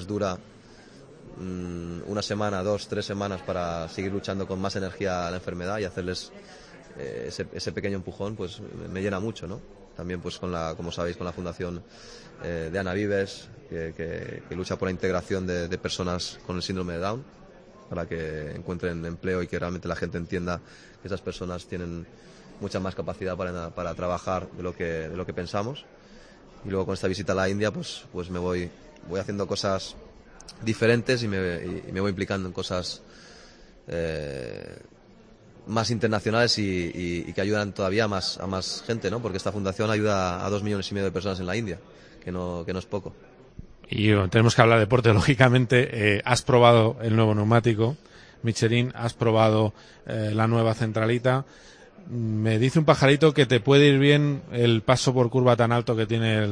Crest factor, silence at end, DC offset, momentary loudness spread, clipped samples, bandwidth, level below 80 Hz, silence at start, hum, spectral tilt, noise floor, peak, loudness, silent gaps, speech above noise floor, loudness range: 24 dB; 0 s; under 0.1%; 16 LU; under 0.1%; 10.5 kHz; -52 dBFS; 0 s; none; -6 dB/octave; -52 dBFS; -2 dBFS; -26 LUFS; none; 27 dB; 13 LU